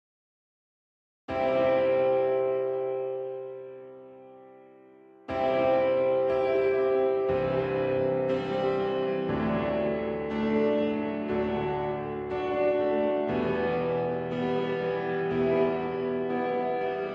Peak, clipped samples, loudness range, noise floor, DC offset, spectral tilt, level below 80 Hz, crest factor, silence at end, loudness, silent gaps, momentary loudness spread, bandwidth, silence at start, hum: -12 dBFS; under 0.1%; 4 LU; -54 dBFS; under 0.1%; -8.5 dB/octave; -56 dBFS; 16 dB; 0 s; -28 LUFS; none; 8 LU; 6 kHz; 1.3 s; none